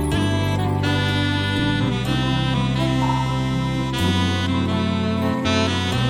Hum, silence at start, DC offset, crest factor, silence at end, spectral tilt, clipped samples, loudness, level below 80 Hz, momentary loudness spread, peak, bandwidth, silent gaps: none; 0 s; under 0.1%; 14 dB; 0 s; -6 dB/octave; under 0.1%; -21 LUFS; -36 dBFS; 2 LU; -6 dBFS; 17 kHz; none